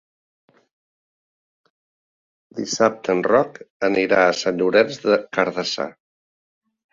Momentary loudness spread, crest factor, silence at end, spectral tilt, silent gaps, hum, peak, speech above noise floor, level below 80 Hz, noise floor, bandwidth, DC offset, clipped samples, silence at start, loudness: 11 LU; 20 dB; 1 s; -4 dB/octave; 3.70-3.80 s; none; -2 dBFS; over 71 dB; -64 dBFS; under -90 dBFS; 7.6 kHz; under 0.1%; under 0.1%; 2.55 s; -20 LUFS